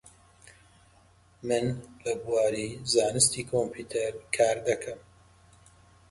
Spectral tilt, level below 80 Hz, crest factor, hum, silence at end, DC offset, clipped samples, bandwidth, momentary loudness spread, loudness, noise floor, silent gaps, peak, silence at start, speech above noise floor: -3 dB/octave; -60 dBFS; 22 dB; none; 1.1 s; under 0.1%; under 0.1%; 12 kHz; 11 LU; -28 LUFS; -60 dBFS; none; -8 dBFS; 0.05 s; 32 dB